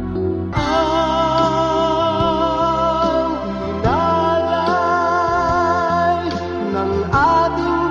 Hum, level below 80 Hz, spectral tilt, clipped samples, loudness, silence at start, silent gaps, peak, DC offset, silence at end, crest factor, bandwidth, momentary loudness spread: none; -36 dBFS; -6.5 dB/octave; under 0.1%; -17 LUFS; 0 s; none; -4 dBFS; under 0.1%; 0 s; 14 dB; 7.6 kHz; 5 LU